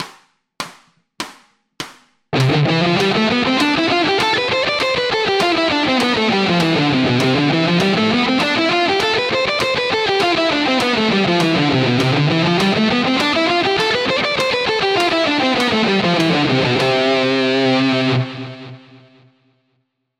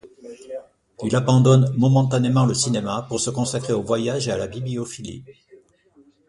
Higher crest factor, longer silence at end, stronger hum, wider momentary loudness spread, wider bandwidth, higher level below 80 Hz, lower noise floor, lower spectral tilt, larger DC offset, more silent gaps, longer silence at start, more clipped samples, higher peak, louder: about the same, 16 dB vs 18 dB; first, 1.4 s vs 0.95 s; neither; second, 6 LU vs 20 LU; first, 15 kHz vs 11.5 kHz; about the same, -50 dBFS vs -54 dBFS; first, -68 dBFS vs -56 dBFS; about the same, -5 dB/octave vs -6 dB/octave; neither; neither; about the same, 0 s vs 0.05 s; neither; about the same, -2 dBFS vs -4 dBFS; first, -15 LUFS vs -20 LUFS